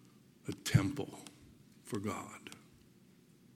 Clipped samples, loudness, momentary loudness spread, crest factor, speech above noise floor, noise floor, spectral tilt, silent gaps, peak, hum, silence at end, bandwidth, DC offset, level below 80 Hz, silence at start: under 0.1%; -38 LUFS; 23 LU; 26 dB; 28 dB; -64 dBFS; -5.5 dB/octave; none; -14 dBFS; none; 1 s; 16.5 kHz; under 0.1%; -62 dBFS; 0.45 s